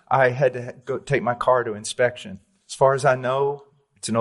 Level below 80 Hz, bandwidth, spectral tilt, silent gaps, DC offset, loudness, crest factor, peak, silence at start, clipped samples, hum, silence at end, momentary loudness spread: -58 dBFS; 11.5 kHz; -5 dB/octave; none; under 0.1%; -22 LUFS; 16 dB; -6 dBFS; 0.1 s; under 0.1%; none; 0 s; 16 LU